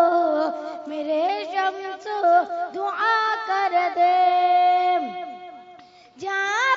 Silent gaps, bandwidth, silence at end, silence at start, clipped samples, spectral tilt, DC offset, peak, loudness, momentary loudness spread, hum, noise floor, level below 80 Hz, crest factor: none; 7.4 kHz; 0 s; 0 s; under 0.1%; -2.5 dB/octave; under 0.1%; -8 dBFS; -22 LUFS; 14 LU; none; -48 dBFS; -78 dBFS; 14 dB